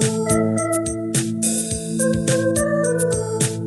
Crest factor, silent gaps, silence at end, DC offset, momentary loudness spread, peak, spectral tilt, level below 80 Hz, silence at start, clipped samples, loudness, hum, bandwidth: 16 dB; none; 0 s; under 0.1%; 3 LU; -4 dBFS; -4.5 dB/octave; -44 dBFS; 0 s; under 0.1%; -20 LUFS; none; 15.5 kHz